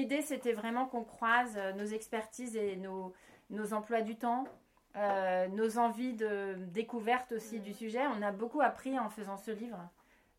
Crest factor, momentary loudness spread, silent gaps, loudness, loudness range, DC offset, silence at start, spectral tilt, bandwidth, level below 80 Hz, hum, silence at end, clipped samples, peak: 22 dB; 11 LU; none; -36 LUFS; 3 LU; under 0.1%; 0 s; -5 dB/octave; 16.5 kHz; -76 dBFS; none; 0.5 s; under 0.1%; -14 dBFS